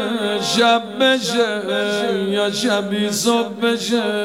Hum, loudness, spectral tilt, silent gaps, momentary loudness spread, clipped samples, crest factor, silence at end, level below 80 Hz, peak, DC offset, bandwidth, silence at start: none; -18 LUFS; -3.5 dB/octave; none; 4 LU; under 0.1%; 14 dB; 0 s; -72 dBFS; -4 dBFS; 0.1%; 16.5 kHz; 0 s